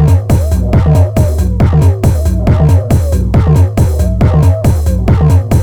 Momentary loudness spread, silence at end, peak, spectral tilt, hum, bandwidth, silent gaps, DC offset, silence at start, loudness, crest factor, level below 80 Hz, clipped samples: 3 LU; 0 s; 0 dBFS; -8 dB/octave; none; 16 kHz; none; under 0.1%; 0 s; -10 LUFS; 8 dB; -14 dBFS; under 0.1%